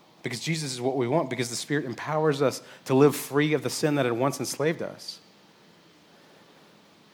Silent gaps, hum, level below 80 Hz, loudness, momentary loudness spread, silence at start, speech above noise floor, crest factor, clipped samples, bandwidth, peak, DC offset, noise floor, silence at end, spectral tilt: none; none; -76 dBFS; -26 LUFS; 13 LU; 0.25 s; 30 dB; 22 dB; under 0.1%; 19.5 kHz; -6 dBFS; under 0.1%; -56 dBFS; 1.95 s; -5 dB/octave